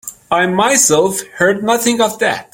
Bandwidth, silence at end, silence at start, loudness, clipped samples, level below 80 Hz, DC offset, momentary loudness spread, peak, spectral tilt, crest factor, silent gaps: 17 kHz; 0.1 s; 0.05 s; -13 LUFS; under 0.1%; -54 dBFS; under 0.1%; 7 LU; 0 dBFS; -2.5 dB/octave; 14 dB; none